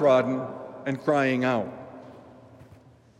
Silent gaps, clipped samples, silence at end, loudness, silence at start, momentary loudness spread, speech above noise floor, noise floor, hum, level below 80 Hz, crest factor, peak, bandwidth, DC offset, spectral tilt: none; under 0.1%; 0.55 s; -26 LUFS; 0 s; 21 LU; 30 dB; -53 dBFS; none; -70 dBFS; 18 dB; -10 dBFS; 9.4 kHz; under 0.1%; -7 dB/octave